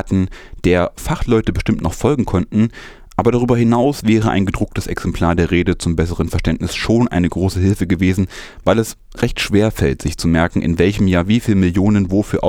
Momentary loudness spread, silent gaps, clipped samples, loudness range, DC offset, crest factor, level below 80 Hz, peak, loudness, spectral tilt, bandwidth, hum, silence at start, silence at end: 7 LU; none; under 0.1%; 2 LU; under 0.1%; 16 dB; -30 dBFS; 0 dBFS; -17 LUFS; -6.5 dB/octave; 17 kHz; none; 0 s; 0 s